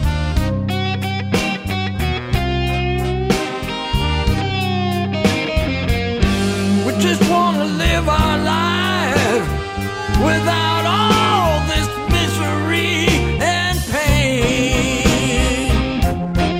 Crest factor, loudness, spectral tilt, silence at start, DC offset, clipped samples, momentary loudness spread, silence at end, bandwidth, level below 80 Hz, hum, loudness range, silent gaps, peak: 16 dB; -17 LUFS; -5 dB/octave; 0 s; under 0.1%; under 0.1%; 5 LU; 0 s; 16 kHz; -26 dBFS; none; 3 LU; none; 0 dBFS